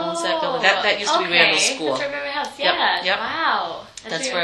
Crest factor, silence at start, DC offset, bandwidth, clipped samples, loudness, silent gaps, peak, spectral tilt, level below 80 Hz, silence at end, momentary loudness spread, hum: 20 dB; 0 s; under 0.1%; 12.5 kHz; under 0.1%; -19 LUFS; none; 0 dBFS; -1.5 dB/octave; -60 dBFS; 0 s; 11 LU; none